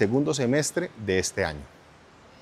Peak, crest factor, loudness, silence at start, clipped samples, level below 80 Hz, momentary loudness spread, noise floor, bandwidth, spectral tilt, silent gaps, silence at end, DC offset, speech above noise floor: -6 dBFS; 20 dB; -26 LUFS; 0 s; under 0.1%; -54 dBFS; 7 LU; -53 dBFS; 15 kHz; -4.5 dB/octave; none; 0.75 s; under 0.1%; 27 dB